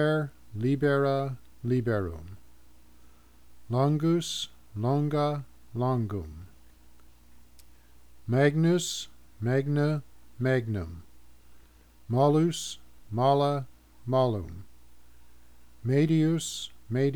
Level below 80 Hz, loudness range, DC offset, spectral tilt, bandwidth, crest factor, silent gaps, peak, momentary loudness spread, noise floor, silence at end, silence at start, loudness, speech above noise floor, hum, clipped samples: -56 dBFS; 4 LU; 0.3%; -6.5 dB/octave; 18.5 kHz; 18 dB; none; -10 dBFS; 17 LU; -58 dBFS; 0 s; 0 s; -28 LUFS; 32 dB; none; under 0.1%